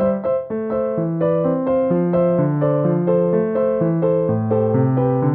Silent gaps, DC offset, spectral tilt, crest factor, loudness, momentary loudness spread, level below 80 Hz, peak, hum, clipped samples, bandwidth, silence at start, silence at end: none; under 0.1%; -14 dB/octave; 12 dB; -18 LUFS; 4 LU; -50 dBFS; -6 dBFS; none; under 0.1%; 3.4 kHz; 0 s; 0 s